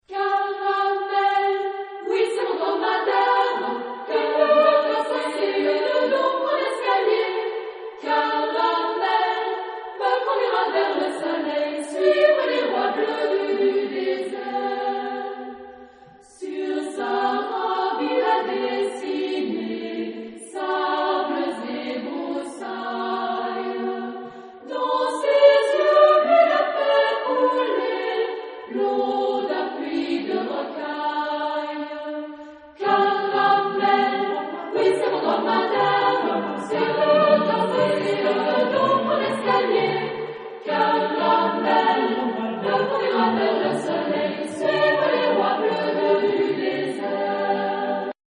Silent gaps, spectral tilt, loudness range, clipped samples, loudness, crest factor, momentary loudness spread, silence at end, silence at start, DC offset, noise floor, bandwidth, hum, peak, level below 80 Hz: none; -5 dB/octave; 7 LU; under 0.1%; -22 LUFS; 18 dB; 11 LU; 0.2 s; 0.1 s; under 0.1%; -48 dBFS; 10 kHz; none; -4 dBFS; -72 dBFS